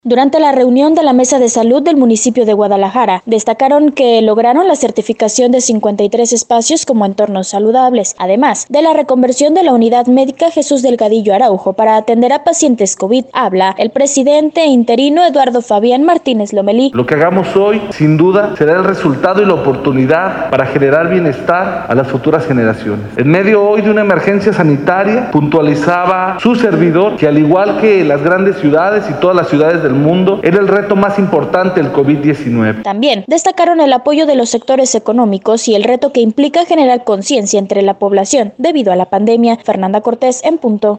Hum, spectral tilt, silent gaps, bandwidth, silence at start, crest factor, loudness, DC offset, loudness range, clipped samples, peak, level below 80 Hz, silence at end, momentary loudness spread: none; -5 dB/octave; none; 9.6 kHz; 0.05 s; 10 dB; -10 LUFS; under 0.1%; 2 LU; under 0.1%; 0 dBFS; -50 dBFS; 0 s; 4 LU